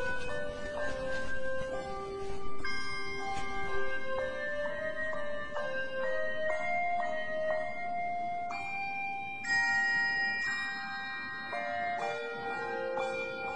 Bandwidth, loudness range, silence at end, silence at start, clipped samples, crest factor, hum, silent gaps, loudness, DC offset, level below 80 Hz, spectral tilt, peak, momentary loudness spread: 10.5 kHz; 6 LU; 0 s; 0 s; under 0.1%; 14 dB; none; none; -34 LUFS; 1%; -54 dBFS; -3.5 dB/octave; -18 dBFS; 9 LU